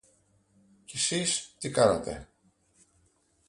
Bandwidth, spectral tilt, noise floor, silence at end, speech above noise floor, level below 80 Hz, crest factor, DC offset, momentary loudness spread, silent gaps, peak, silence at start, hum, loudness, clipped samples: 11.5 kHz; -3 dB/octave; -68 dBFS; 1.25 s; 40 dB; -58 dBFS; 24 dB; under 0.1%; 15 LU; none; -8 dBFS; 0.9 s; none; -28 LUFS; under 0.1%